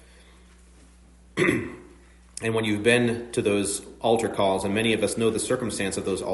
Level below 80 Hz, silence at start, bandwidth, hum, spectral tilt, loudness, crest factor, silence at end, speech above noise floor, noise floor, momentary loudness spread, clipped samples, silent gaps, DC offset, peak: -54 dBFS; 1.35 s; 11.5 kHz; none; -4.5 dB/octave; -25 LUFS; 20 dB; 0 s; 28 dB; -52 dBFS; 9 LU; under 0.1%; none; under 0.1%; -6 dBFS